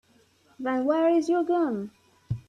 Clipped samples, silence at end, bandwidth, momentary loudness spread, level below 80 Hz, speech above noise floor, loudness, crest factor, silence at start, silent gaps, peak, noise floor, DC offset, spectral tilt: under 0.1%; 0.1 s; 9 kHz; 13 LU; -60 dBFS; 38 dB; -26 LUFS; 14 dB; 0.6 s; none; -12 dBFS; -62 dBFS; under 0.1%; -7.5 dB/octave